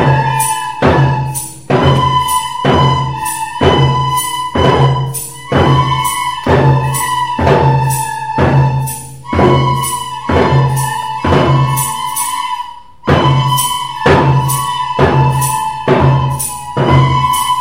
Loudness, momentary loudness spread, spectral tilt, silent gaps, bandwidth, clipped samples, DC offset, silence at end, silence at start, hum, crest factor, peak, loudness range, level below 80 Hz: -12 LUFS; 8 LU; -5 dB/octave; none; 16.5 kHz; under 0.1%; 1%; 0 s; 0 s; none; 12 dB; 0 dBFS; 1 LU; -34 dBFS